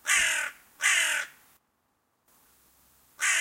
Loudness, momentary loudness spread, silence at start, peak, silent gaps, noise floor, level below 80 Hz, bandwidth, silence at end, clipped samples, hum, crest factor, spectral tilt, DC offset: -25 LUFS; 11 LU; 0.05 s; -10 dBFS; none; -74 dBFS; -68 dBFS; 16.5 kHz; 0 s; under 0.1%; none; 22 dB; 3.5 dB/octave; under 0.1%